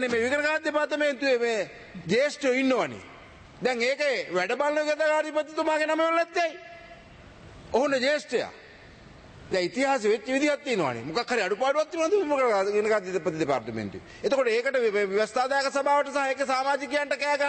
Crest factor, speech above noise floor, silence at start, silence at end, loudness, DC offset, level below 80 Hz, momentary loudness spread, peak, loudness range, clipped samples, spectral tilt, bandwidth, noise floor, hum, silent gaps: 16 dB; 23 dB; 0 s; 0 s; -26 LUFS; under 0.1%; -62 dBFS; 7 LU; -12 dBFS; 3 LU; under 0.1%; -4 dB/octave; 8.8 kHz; -49 dBFS; none; none